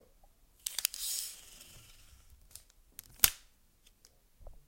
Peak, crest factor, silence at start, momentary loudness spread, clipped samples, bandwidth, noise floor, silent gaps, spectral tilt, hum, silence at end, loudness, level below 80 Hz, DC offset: -4 dBFS; 36 dB; 0.65 s; 26 LU; under 0.1%; 17 kHz; -66 dBFS; none; 1 dB/octave; none; 0.15 s; -32 LUFS; -58 dBFS; under 0.1%